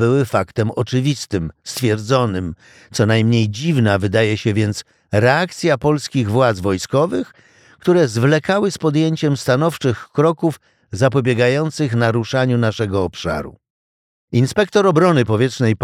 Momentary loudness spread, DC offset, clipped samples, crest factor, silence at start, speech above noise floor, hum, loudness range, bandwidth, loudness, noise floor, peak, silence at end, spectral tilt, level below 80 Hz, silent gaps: 9 LU; under 0.1%; under 0.1%; 16 dB; 0 s; over 74 dB; none; 2 LU; 15 kHz; -17 LUFS; under -90 dBFS; -2 dBFS; 0 s; -6 dB/octave; -48 dBFS; 13.70-14.28 s